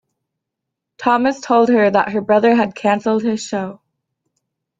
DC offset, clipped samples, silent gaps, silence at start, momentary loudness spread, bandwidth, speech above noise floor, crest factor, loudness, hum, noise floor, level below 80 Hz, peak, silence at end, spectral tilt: under 0.1%; under 0.1%; none; 1 s; 9 LU; 7.8 kHz; 65 dB; 16 dB; -16 LUFS; none; -80 dBFS; -62 dBFS; -2 dBFS; 1.05 s; -5.5 dB/octave